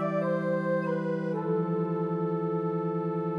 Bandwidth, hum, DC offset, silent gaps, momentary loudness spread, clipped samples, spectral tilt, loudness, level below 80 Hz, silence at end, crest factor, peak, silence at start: 5.2 kHz; none; under 0.1%; none; 2 LU; under 0.1%; -10 dB/octave; -30 LUFS; -72 dBFS; 0 s; 12 dB; -16 dBFS; 0 s